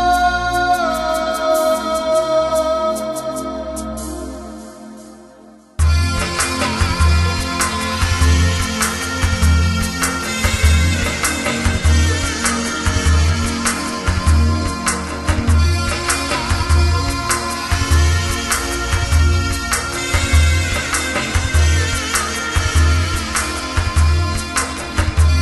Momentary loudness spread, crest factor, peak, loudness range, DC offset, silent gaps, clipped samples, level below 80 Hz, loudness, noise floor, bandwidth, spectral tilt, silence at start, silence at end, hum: 5 LU; 16 dB; -2 dBFS; 4 LU; under 0.1%; none; under 0.1%; -20 dBFS; -17 LUFS; -43 dBFS; 12.5 kHz; -4 dB/octave; 0 s; 0 s; none